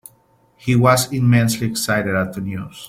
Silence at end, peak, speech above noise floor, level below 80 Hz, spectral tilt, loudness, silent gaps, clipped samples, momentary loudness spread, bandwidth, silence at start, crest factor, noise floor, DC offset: 0 s; -2 dBFS; 39 dB; -50 dBFS; -5.5 dB/octave; -18 LUFS; none; under 0.1%; 13 LU; 16 kHz; 0.65 s; 18 dB; -56 dBFS; under 0.1%